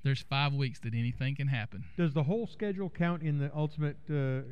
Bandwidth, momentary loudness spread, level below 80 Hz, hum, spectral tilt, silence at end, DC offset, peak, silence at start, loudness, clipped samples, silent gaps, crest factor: 8.4 kHz; 5 LU; -60 dBFS; none; -8 dB/octave; 0 s; 0.5%; -18 dBFS; 0.05 s; -33 LUFS; under 0.1%; none; 14 dB